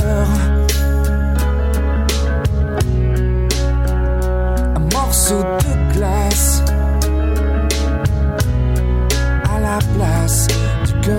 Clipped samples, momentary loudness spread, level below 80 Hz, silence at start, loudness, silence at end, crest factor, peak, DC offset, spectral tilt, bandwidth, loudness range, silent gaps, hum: under 0.1%; 3 LU; -16 dBFS; 0 s; -16 LUFS; 0 s; 12 dB; -2 dBFS; under 0.1%; -5 dB/octave; 17 kHz; 1 LU; none; none